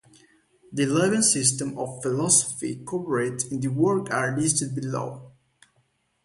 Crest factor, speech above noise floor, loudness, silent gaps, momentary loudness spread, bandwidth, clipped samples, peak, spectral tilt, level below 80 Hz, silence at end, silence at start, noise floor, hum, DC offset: 20 dB; 44 dB; -23 LUFS; none; 12 LU; 11.5 kHz; under 0.1%; -4 dBFS; -4 dB/octave; -64 dBFS; 0.95 s; 0.7 s; -69 dBFS; none; under 0.1%